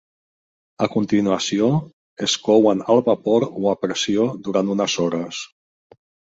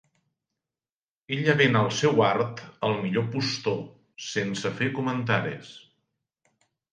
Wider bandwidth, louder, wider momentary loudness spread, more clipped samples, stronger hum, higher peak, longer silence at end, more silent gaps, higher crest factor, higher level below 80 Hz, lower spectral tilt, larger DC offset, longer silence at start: second, 8 kHz vs 9.8 kHz; first, -20 LUFS vs -26 LUFS; second, 9 LU vs 13 LU; neither; neither; first, -2 dBFS vs -8 dBFS; second, 0.95 s vs 1.15 s; first, 1.93-2.16 s vs none; about the same, 18 dB vs 20 dB; first, -60 dBFS vs -66 dBFS; about the same, -5 dB/octave vs -5.5 dB/octave; neither; second, 0.8 s vs 1.3 s